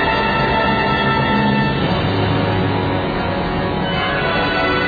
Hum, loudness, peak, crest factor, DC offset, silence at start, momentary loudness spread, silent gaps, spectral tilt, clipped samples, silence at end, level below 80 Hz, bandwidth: none; -17 LUFS; -4 dBFS; 12 dB; under 0.1%; 0 s; 4 LU; none; -8 dB/octave; under 0.1%; 0 s; -32 dBFS; 4.9 kHz